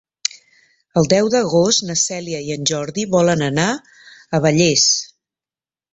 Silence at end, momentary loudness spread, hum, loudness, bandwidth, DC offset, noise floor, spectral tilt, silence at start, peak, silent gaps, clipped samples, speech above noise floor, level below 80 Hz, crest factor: 0.85 s; 11 LU; none; -17 LUFS; 8.2 kHz; under 0.1%; under -90 dBFS; -3.5 dB/octave; 0.35 s; -2 dBFS; none; under 0.1%; over 74 dB; -54 dBFS; 16 dB